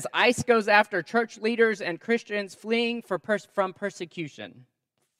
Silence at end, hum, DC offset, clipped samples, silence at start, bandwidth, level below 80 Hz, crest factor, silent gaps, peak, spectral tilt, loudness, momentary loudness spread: 0.6 s; none; under 0.1%; under 0.1%; 0 s; 13.5 kHz; -70 dBFS; 22 dB; none; -4 dBFS; -4 dB/octave; -25 LUFS; 15 LU